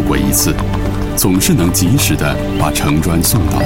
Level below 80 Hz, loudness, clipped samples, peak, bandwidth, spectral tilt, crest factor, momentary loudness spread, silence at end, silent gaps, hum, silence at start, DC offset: -24 dBFS; -13 LUFS; under 0.1%; 0 dBFS; 17 kHz; -4.5 dB/octave; 12 dB; 5 LU; 0 s; none; none; 0 s; 3%